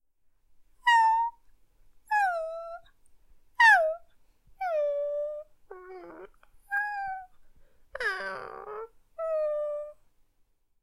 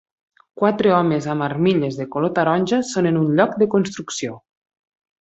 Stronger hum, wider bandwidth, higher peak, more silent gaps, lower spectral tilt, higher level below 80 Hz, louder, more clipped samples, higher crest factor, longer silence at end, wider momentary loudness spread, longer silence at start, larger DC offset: neither; first, 15 kHz vs 8.2 kHz; second, -10 dBFS vs -2 dBFS; neither; second, -1 dB/octave vs -6 dB/octave; about the same, -64 dBFS vs -60 dBFS; second, -27 LUFS vs -19 LUFS; neither; about the same, 20 dB vs 18 dB; about the same, 0.9 s vs 0.85 s; first, 24 LU vs 9 LU; first, 0.85 s vs 0.55 s; neither